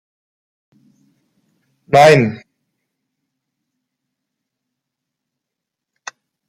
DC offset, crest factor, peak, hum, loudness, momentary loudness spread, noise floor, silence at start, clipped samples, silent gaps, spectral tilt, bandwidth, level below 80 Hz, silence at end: under 0.1%; 20 dB; 0 dBFS; none; -11 LUFS; 26 LU; -82 dBFS; 1.9 s; under 0.1%; none; -5.5 dB/octave; 16 kHz; -62 dBFS; 4.15 s